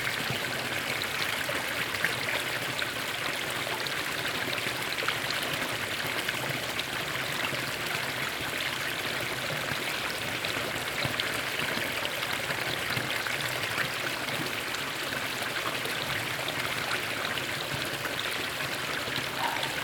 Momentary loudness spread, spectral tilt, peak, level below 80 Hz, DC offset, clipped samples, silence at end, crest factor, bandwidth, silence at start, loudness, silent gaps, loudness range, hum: 2 LU; -2 dB/octave; -10 dBFS; -60 dBFS; under 0.1%; under 0.1%; 0 s; 22 dB; over 20 kHz; 0 s; -30 LUFS; none; 1 LU; none